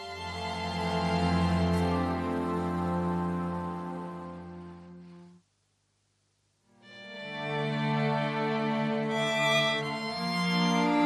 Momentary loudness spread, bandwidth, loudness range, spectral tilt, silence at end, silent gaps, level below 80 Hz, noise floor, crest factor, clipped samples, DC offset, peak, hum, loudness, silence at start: 17 LU; 13 kHz; 16 LU; -5.5 dB/octave; 0 s; none; -52 dBFS; -74 dBFS; 16 dB; under 0.1%; under 0.1%; -14 dBFS; none; -30 LUFS; 0 s